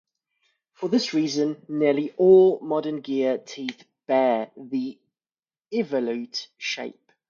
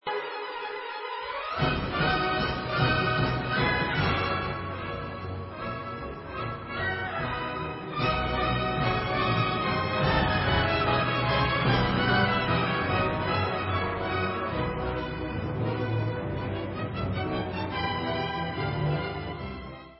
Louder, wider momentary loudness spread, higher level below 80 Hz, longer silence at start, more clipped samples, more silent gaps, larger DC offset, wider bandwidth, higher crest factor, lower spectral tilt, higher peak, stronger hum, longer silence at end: first, -24 LUFS vs -28 LUFS; first, 17 LU vs 10 LU; second, -74 dBFS vs -42 dBFS; first, 0.8 s vs 0.05 s; neither; first, 5.39-5.43 s vs none; neither; first, 7.2 kHz vs 5.8 kHz; about the same, 18 dB vs 18 dB; second, -5.5 dB/octave vs -10 dB/octave; first, -6 dBFS vs -10 dBFS; neither; first, 0.35 s vs 0 s